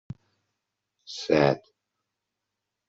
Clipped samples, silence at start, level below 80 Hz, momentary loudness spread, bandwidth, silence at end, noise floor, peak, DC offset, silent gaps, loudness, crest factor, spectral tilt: under 0.1%; 1.1 s; -64 dBFS; 23 LU; 8 kHz; 1.3 s; -84 dBFS; -6 dBFS; under 0.1%; none; -25 LUFS; 24 dB; -6 dB/octave